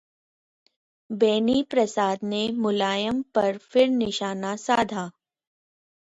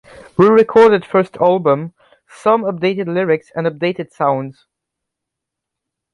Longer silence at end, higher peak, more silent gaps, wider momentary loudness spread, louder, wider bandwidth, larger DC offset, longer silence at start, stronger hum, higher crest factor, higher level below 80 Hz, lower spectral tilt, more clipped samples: second, 1 s vs 1.6 s; second, -8 dBFS vs -2 dBFS; neither; second, 8 LU vs 11 LU; second, -24 LUFS vs -15 LUFS; second, 8.4 kHz vs 10.5 kHz; neither; first, 1.1 s vs 0.4 s; neither; about the same, 18 dB vs 16 dB; about the same, -62 dBFS vs -58 dBFS; second, -4.5 dB/octave vs -7.5 dB/octave; neither